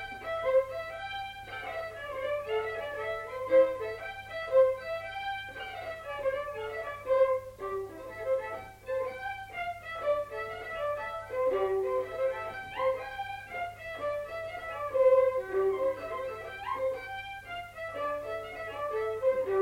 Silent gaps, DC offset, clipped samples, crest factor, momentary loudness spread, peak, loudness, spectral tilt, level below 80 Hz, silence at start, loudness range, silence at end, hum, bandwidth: none; under 0.1%; under 0.1%; 18 dB; 13 LU; -14 dBFS; -32 LUFS; -5 dB/octave; -60 dBFS; 0 s; 5 LU; 0 s; 50 Hz at -65 dBFS; 16 kHz